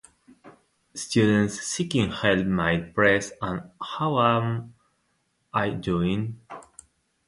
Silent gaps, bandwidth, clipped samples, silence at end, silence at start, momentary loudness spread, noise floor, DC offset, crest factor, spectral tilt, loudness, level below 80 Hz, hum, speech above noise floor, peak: none; 11.5 kHz; under 0.1%; 0.65 s; 0.45 s; 14 LU; -71 dBFS; under 0.1%; 20 dB; -5 dB/octave; -25 LUFS; -52 dBFS; none; 47 dB; -6 dBFS